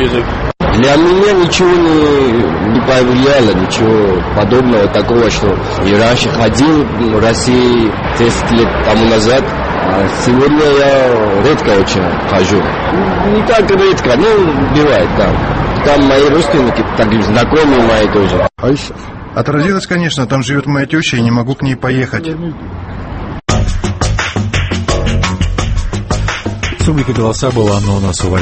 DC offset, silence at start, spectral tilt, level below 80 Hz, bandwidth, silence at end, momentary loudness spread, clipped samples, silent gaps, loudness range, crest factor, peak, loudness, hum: under 0.1%; 0 s; -5.5 dB/octave; -24 dBFS; 8.8 kHz; 0 s; 7 LU; under 0.1%; none; 6 LU; 10 dB; 0 dBFS; -11 LUFS; none